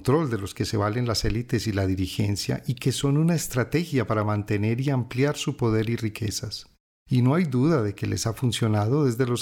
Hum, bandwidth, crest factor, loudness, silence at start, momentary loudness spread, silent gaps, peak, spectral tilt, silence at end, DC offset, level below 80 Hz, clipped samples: none; 17.5 kHz; 14 dB; -25 LUFS; 0 s; 6 LU; 6.80-7.06 s; -10 dBFS; -6 dB/octave; 0 s; under 0.1%; -46 dBFS; under 0.1%